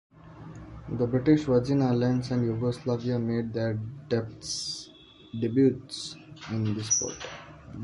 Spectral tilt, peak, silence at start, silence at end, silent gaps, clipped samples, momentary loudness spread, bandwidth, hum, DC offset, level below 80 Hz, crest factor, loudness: -5.5 dB/octave; -10 dBFS; 0.25 s; 0 s; none; under 0.1%; 20 LU; 11.5 kHz; none; under 0.1%; -54 dBFS; 18 dB; -28 LUFS